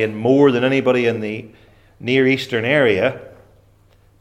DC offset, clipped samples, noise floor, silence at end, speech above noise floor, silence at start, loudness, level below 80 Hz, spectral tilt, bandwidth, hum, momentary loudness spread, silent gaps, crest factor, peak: under 0.1%; under 0.1%; -53 dBFS; 0.95 s; 36 dB; 0 s; -17 LUFS; -56 dBFS; -6.5 dB/octave; 13 kHz; none; 14 LU; none; 18 dB; -2 dBFS